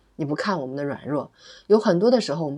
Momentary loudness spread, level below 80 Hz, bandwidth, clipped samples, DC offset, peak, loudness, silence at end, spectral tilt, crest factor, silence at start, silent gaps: 11 LU; -68 dBFS; 11 kHz; under 0.1%; under 0.1%; -6 dBFS; -23 LUFS; 0 s; -6.5 dB/octave; 18 dB; 0.2 s; none